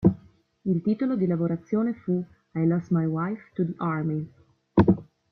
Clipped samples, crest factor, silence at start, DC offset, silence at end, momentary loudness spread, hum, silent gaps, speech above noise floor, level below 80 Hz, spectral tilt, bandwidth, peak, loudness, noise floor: under 0.1%; 22 dB; 0 s; under 0.1%; 0.3 s; 9 LU; none; none; 28 dB; -54 dBFS; -11 dB/octave; 4.5 kHz; -4 dBFS; -26 LUFS; -54 dBFS